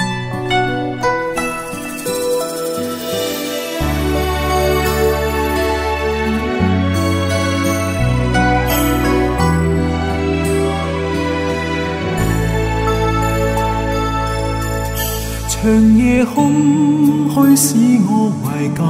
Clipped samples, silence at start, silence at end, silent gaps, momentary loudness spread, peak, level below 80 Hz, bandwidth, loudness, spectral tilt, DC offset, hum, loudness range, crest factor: under 0.1%; 0 s; 0 s; none; 8 LU; 0 dBFS; -26 dBFS; 16.5 kHz; -16 LUFS; -5.5 dB/octave; under 0.1%; none; 6 LU; 14 dB